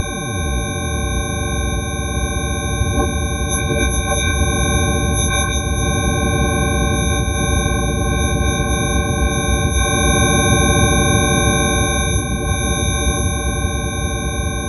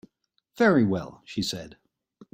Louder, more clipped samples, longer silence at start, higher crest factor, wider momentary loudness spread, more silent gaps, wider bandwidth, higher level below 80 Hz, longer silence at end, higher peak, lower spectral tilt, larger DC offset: first, -17 LUFS vs -25 LUFS; neither; second, 0 s vs 0.6 s; about the same, 16 dB vs 20 dB; second, 7 LU vs 14 LU; neither; second, 12.5 kHz vs 16 kHz; first, -22 dBFS vs -62 dBFS; second, 0 s vs 0.65 s; first, -2 dBFS vs -8 dBFS; second, -4 dB/octave vs -5.5 dB/octave; neither